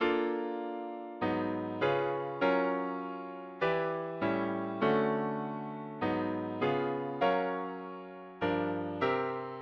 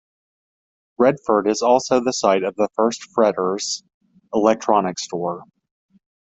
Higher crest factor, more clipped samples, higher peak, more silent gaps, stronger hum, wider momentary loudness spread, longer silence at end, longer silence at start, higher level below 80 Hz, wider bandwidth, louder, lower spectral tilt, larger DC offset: about the same, 18 dB vs 18 dB; neither; second, -16 dBFS vs -2 dBFS; second, none vs 3.94-4.01 s; neither; about the same, 10 LU vs 9 LU; second, 0 s vs 0.8 s; second, 0 s vs 1 s; second, -68 dBFS vs -62 dBFS; second, 6.8 kHz vs 8.2 kHz; second, -33 LUFS vs -20 LUFS; first, -8 dB/octave vs -4 dB/octave; neither